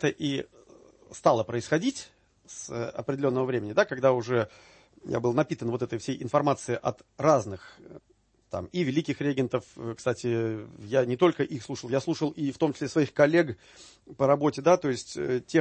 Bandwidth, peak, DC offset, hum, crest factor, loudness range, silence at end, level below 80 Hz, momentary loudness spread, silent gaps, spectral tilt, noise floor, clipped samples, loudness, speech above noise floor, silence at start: 8.8 kHz; -8 dBFS; under 0.1%; none; 20 dB; 4 LU; 0 s; -64 dBFS; 14 LU; none; -6 dB/octave; -55 dBFS; under 0.1%; -27 LUFS; 28 dB; 0 s